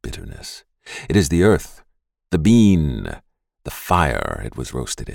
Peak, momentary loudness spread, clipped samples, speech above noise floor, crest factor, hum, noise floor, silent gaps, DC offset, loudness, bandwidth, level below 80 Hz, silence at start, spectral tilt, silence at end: -4 dBFS; 21 LU; under 0.1%; 27 dB; 16 dB; none; -45 dBFS; none; under 0.1%; -18 LUFS; 17 kHz; -34 dBFS; 0.05 s; -6 dB/octave; 0 s